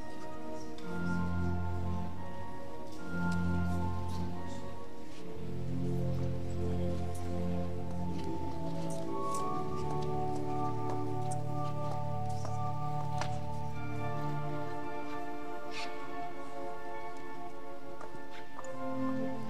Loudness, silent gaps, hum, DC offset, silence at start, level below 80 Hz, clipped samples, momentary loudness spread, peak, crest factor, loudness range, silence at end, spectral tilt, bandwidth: -38 LUFS; none; none; 2%; 0 s; -54 dBFS; under 0.1%; 10 LU; -18 dBFS; 18 dB; 5 LU; 0 s; -7 dB/octave; 15.5 kHz